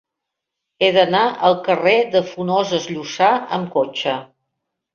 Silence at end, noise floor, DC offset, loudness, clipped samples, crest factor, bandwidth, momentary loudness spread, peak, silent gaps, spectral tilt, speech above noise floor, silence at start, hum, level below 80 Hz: 0.7 s; -81 dBFS; under 0.1%; -18 LUFS; under 0.1%; 18 dB; 7.2 kHz; 8 LU; -2 dBFS; none; -4.5 dB/octave; 64 dB; 0.8 s; none; -62 dBFS